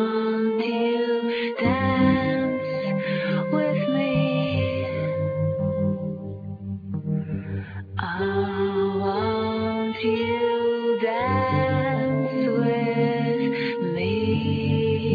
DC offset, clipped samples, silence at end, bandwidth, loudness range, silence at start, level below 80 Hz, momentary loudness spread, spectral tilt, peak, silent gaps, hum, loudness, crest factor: under 0.1%; under 0.1%; 0 s; 5 kHz; 5 LU; 0 s; -54 dBFS; 7 LU; -9.5 dB/octave; -8 dBFS; none; none; -24 LUFS; 16 dB